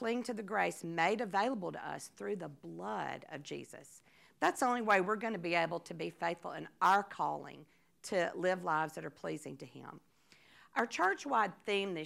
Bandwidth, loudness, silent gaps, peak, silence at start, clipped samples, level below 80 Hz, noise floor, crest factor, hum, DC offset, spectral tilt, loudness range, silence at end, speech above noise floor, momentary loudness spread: 16 kHz; -36 LUFS; none; -14 dBFS; 0 s; under 0.1%; -84 dBFS; -66 dBFS; 22 dB; none; under 0.1%; -4.5 dB/octave; 5 LU; 0 s; 30 dB; 16 LU